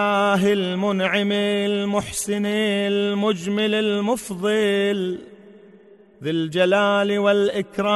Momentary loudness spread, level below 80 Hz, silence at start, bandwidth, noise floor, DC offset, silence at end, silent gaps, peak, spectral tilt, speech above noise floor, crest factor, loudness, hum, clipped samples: 6 LU; -58 dBFS; 0 s; 12 kHz; -49 dBFS; under 0.1%; 0 s; none; -6 dBFS; -5 dB/octave; 29 dB; 14 dB; -21 LUFS; none; under 0.1%